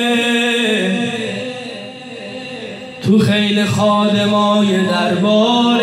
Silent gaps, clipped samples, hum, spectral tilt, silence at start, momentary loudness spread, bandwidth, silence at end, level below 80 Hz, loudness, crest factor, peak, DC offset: none; under 0.1%; none; -5 dB/octave; 0 s; 15 LU; 13.5 kHz; 0 s; -60 dBFS; -14 LUFS; 12 dB; -4 dBFS; under 0.1%